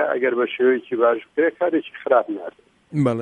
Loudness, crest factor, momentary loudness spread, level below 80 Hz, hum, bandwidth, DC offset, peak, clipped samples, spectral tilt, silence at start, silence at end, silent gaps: -21 LUFS; 16 dB; 10 LU; -68 dBFS; none; 9.6 kHz; under 0.1%; -4 dBFS; under 0.1%; -8 dB/octave; 0 s; 0 s; none